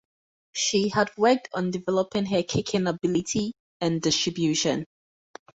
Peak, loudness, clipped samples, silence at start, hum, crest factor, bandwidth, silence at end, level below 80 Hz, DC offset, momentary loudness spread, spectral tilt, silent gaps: -8 dBFS; -25 LUFS; under 0.1%; 0.55 s; none; 18 dB; 8.2 kHz; 0.75 s; -58 dBFS; under 0.1%; 7 LU; -4 dB/octave; 3.60-3.80 s